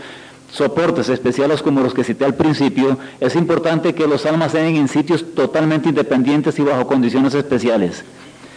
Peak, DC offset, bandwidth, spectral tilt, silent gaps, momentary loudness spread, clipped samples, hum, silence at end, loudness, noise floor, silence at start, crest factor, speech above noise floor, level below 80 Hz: -2 dBFS; under 0.1%; 10.5 kHz; -6.5 dB/octave; none; 4 LU; under 0.1%; none; 0 s; -16 LUFS; -37 dBFS; 0 s; 14 dB; 21 dB; -56 dBFS